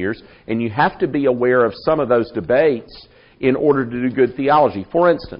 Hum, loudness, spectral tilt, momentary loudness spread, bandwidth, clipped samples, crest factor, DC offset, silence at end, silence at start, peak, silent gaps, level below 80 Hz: none; -17 LUFS; -5.5 dB/octave; 7 LU; 5.4 kHz; under 0.1%; 16 dB; under 0.1%; 0 s; 0 s; -2 dBFS; none; -48 dBFS